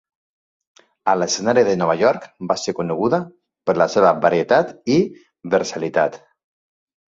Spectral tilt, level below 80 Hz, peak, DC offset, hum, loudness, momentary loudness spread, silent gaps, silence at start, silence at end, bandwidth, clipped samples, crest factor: -5 dB/octave; -60 dBFS; -2 dBFS; under 0.1%; none; -19 LUFS; 10 LU; none; 1.05 s; 0.95 s; 7.8 kHz; under 0.1%; 18 dB